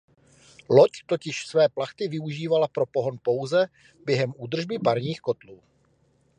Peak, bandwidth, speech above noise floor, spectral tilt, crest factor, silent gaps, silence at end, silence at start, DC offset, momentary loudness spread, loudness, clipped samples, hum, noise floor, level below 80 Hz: -4 dBFS; 10.5 kHz; 40 dB; -6 dB/octave; 22 dB; none; 0.85 s; 0.7 s; under 0.1%; 11 LU; -25 LUFS; under 0.1%; none; -65 dBFS; -70 dBFS